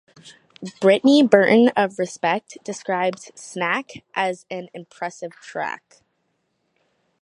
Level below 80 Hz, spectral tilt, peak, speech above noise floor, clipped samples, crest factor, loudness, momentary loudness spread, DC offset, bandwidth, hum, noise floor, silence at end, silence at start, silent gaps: -72 dBFS; -5 dB/octave; 0 dBFS; 51 dB; under 0.1%; 20 dB; -20 LUFS; 21 LU; under 0.1%; 11 kHz; none; -71 dBFS; 1.45 s; 0.25 s; none